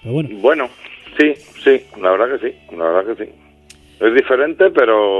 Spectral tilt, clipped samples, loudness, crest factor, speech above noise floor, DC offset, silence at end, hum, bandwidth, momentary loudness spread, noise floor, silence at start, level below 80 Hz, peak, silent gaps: -6.5 dB/octave; under 0.1%; -15 LUFS; 16 dB; 31 dB; under 0.1%; 0 s; none; 9.6 kHz; 13 LU; -46 dBFS; 0.05 s; -54 dBFS; 0 dBFS; none